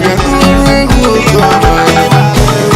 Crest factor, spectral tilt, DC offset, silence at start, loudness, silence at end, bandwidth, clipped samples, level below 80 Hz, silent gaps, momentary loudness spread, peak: 6 dB; -5.5 dB/octave; under 0.1%; 0 s; -7 LUFS; 0 s; 16.5 kHz; 2%; -16 dBFS; none; 2 LU; 0 dBFS